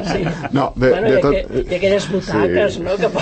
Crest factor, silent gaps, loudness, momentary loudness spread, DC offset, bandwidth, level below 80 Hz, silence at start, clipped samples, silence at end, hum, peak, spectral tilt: 14 dB; none; -17 LUFS; 6 LU; under 0.1%; 8.8 kHz; -34 dBFS; 0 s; under 0.1%; 0 s; none; -4 dBFS; -6 dB/octave